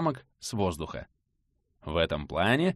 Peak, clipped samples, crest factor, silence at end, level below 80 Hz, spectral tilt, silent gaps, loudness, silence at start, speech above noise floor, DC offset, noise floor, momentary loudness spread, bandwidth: -12 dBFS; under 0.1%; 18 dB; 0 s; -48 dBFS; -5.5 dB/octave; none; -30 LUFS; 0 s; 46 dB; under 0.1%; -76 dBFS; 14 LU; 13 kHz